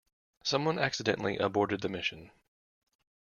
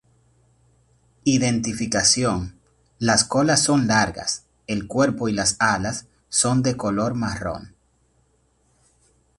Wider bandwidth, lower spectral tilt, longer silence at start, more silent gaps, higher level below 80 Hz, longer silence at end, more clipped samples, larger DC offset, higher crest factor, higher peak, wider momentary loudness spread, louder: second, 7.2 kHz vs 11.5 kHz; about the same, -4.5 dB/octave vs -3.5 dB/octave; second, 0.45 s vs 1.25 s; neither; second, -68 dBFS vs -48 dBFS; second, 1.1 s vs 1.7 s; neither; neither; about the same, 22 dB vs 20 dB; second, -12 dBFS vs -4 dBFS; second, 6 LU vs 12 LU; second, -31 LUFS vs -21 LUFS